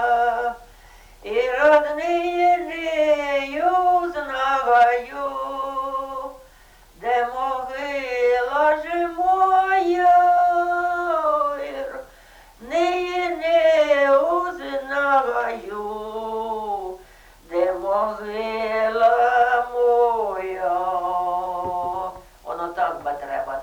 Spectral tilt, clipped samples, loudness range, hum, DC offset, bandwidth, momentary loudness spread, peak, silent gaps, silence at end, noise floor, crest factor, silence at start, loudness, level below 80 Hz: -4 dB/octave; under 0.1%; 6 LU; none; under 0.1%; 19 kHz; 13 LU; -6 dBFS; none; 0 s; -50 dBFS; 16 dB; 0 s; -21 LUFS; -52 dBFS